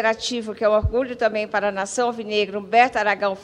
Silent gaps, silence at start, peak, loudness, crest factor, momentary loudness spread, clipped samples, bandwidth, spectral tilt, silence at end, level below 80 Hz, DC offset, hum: none; 0 s; -2 dBFS; -21 LUFS; 18 dB; 6 LU; under 0.1%; 11 kHz; -4 dB/octave; 0 s; -40 dBFS; under 0.1%; none